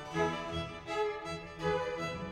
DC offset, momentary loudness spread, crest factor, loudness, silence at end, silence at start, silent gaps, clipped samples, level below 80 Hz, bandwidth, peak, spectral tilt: under 0.1%; 6 LU; 16 dB; -36 LUFS; 0 s; 0 s; none; under 0.1%; -56 dBFS; 12.5 kHz; -20 dBFS; -5 dB/octave